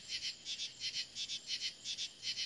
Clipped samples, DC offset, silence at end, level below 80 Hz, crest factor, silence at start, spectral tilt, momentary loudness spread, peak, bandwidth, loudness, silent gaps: under 0.1%; under 0.1%; 0 s; -80 dBFS; 20 dB; 0 s; 1.5 dB/octave; 2 LU; -24 dBFS; 12 kHz; -40 LUFS; none